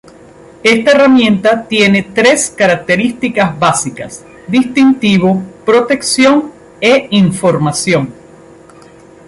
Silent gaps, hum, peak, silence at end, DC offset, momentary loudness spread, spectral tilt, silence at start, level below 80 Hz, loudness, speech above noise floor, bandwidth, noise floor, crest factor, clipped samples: none; none; 0 dBFS; 1.15 s; under 0.1%; 7 LU; -4.5 dB/octave; 0.65 s; -48 dBFS; -10 LUFS; 28 dB; 11.5 kHz; -38 dBFS; 12 dB; under 0.1%